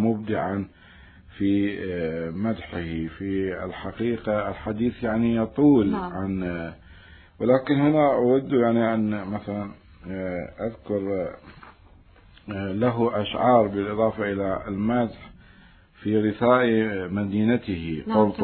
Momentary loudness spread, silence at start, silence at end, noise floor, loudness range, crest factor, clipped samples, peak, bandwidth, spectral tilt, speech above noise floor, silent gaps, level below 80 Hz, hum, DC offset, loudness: 13 LU; 0 s; 0 s; -52 dBFS; 6 LU; 20 dB; under 0.1%; -4 dBFS; 4.5 kHz; -11.5 dB/octave; 29 dB; none; -52 dBFS; none; under 0.1%; -24 LUFS